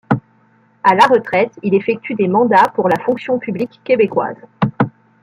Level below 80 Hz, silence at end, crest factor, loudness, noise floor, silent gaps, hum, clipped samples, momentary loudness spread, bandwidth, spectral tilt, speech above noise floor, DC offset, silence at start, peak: -58 dBFS; 0.35 s; 14 dB; -15 LUFS; -53 dBFS; none; none; under 0.1%; 10 LU; 13 kHz; -7 dB/octave; 39 dB; under 0.1%; 0.1 s; 0 dBFS